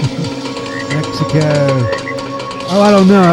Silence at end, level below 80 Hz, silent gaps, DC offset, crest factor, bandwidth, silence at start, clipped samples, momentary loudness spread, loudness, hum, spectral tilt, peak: 0 s; -44 dBFS; none; under 0.1%; 12 dB; 12 kHz; 0 s; 0.5%; 13 LU; -14 LUFS; none; -6.5 dB/octave; 0 dBFS